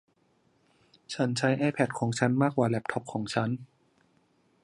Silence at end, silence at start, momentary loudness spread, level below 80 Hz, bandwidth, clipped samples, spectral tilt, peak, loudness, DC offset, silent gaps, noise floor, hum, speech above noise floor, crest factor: 1 s; 1.1 s; 8 LU; -68 dBFS; 11.5 kHz; under 0.1%; -6 dB/octave; -8 dBFS; -29 LUFS; under 0.1%; none; -69 dBFS; none; 41 dB; 22 dB